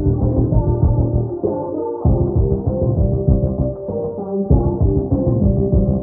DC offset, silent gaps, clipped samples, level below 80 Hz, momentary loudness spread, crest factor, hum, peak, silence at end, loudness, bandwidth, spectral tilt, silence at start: under 0.1%; none; under 0.1%; -22 dBFS; 6 LU; 16 dB; none; 0 dBFS; 0 s; -18 LUFS; 1.6 kHz; -14 dB/octave; 0 s